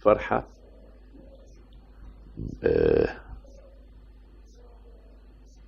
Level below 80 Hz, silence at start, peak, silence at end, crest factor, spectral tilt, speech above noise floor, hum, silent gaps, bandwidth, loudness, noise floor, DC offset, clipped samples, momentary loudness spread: -44 dBFS; 0.05 s; -6 dBFS; 0.75 s; 24 dB; -8.5 dB/octave; 26 dB; none; none; 7 kHz; -26 LUFS; -50 dBFS; under 0.1%; under 0.1%; 29 LU